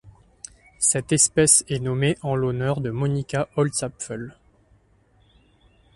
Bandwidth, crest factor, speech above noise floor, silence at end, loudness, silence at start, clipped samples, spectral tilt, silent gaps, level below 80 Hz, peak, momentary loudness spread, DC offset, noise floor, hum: 12 kHz; 22 dB; 37 dB; 1.65 s; -21 LUFS; 0.05 s; under 0.1%; -4 dB/octave; none; -52 dBFS; -2 dBFS; 23 LU; under 0.1%; -59 dBFS; none